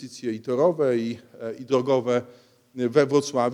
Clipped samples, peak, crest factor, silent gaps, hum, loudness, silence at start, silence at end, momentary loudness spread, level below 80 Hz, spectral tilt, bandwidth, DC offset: under 0.1%; -6 dBFS; 18 dB; none; none; -24 LUFS; 0 s; 0 s; 14 LU; -76 dBFS; -6 dB/octave; 12 kHz; under 0.1%